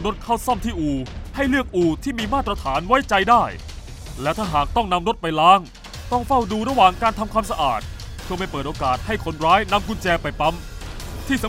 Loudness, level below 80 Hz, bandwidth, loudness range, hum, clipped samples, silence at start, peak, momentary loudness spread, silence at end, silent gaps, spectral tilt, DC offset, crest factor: -20 LUFS; -34 dBFS; 16 kHz; 3 LU; none; under 0.1%; 0 s; 0 dBFS; 17 LU; 0 s; none; -5 dB/octave; under 0.1%; 20 dB